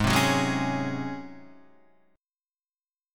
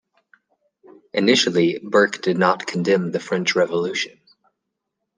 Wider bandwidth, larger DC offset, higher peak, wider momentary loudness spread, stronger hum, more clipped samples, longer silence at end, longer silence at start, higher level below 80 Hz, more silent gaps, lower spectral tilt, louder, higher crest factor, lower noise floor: first, 19 kHz vs 10 kHz; neither; second, -8 dBFS vs -2 dBFS; first, 17 LU vs 8 LU; neither; neither; second, 0 s vs 1.1 s; second, 0 s vs 1.15 s; first, -48 dBFS vs -70 dBFS; neither; about the same, -4.5 dB/octave vs -4.5 dB/octave; second, -26 LUFS vs -20 LUFS; about the same, 20 dB vs 20 dB; first, under -90 dBFS vs -79 dBFS